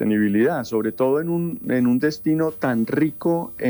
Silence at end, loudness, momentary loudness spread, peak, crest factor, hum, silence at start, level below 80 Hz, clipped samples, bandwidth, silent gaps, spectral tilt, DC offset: 0 s; -21 LUFS; 4 LU; -8 dBFS; 12 dB; none; 0 s; -60 dBFS; under 0.1%; over 20 kHz; none; -8 dB/octave; under 0.1%